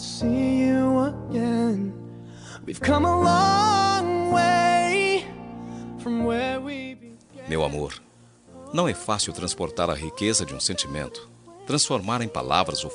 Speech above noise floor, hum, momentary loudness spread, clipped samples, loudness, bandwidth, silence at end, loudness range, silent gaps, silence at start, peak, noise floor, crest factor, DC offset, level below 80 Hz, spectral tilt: 28 dB; none; 18 LU; under 0.1%; -23 LUFS; 11 kHz; 0 s; 8 LU; none; 0 s; -4 dBFS; -51 dBFS; 20 dB; under 0.1%; -48 dBFS; -4 dB/octave